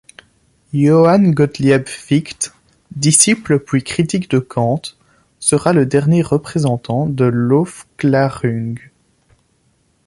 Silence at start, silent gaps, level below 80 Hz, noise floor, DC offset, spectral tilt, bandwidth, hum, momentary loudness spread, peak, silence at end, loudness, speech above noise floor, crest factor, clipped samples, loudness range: 0.75 s; none; -50 dBFS; -59 dBFS; under 0.1%; -5.5 dB/octave; 13 kHz; none; 13 LU; 0 dBFS; 1.3 s; -15 LUFS; 45 dB; 16 dB; under 0.1%; 4 LU